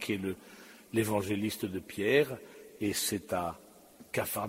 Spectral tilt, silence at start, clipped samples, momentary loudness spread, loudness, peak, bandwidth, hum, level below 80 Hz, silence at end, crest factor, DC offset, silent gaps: -4 dB/octave; 0 s; under 0.1%; 18 LU; -33 LUFS; -14 dBFS; 16 kHz; none; -66 dBFS; 0 s; 20 dB; under 0.1%; none